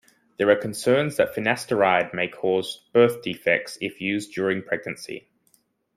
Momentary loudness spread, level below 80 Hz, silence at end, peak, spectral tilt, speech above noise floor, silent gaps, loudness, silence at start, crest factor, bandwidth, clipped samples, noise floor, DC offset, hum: 9 LU; -66 dBFS; 0.8 s; -4 dBFS; -5 dB/octave; 42 dB; none; -23 LUFS; 0.4 s; 20 dB; 15.5 kHz; under 0.1%; -65 dBFS; under 0.1%; none